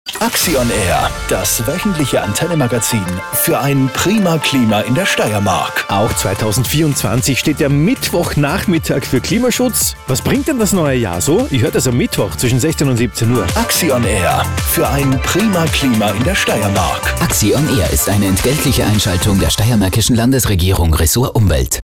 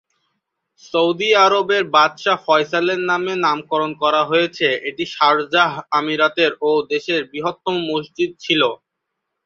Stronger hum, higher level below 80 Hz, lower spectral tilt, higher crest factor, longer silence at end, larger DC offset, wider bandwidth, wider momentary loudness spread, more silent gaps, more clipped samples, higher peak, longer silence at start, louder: neither; first, -26 dBFS vs -66 dBFS; about the same, -4.5 dB/octave vs -4 dB/octave; second, 10 dB vs 18 dB; second, 0.05 s vs 0.7 s; neither; first, 18 kHz vs 7.6 kHz; second, 3 LU vs 8 LU; neither; neither; second, -4 dBFS vs 0 dBFS; second, 0.05 s vs 0.95 s; first, -14 LUFS vs -17 LUFS